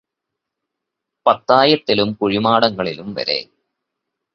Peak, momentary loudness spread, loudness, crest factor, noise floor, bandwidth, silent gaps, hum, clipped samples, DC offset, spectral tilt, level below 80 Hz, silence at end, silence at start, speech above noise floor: 0 dBFS; 11 LU; -17 LUFS; 20 dB; -81 dBFS; 6.6 kHz; none; none; under 0.1%; under 0.1%; -6.5 dB/octave; -56 dBFS; 0.9 s; 1.25 s; 65 dB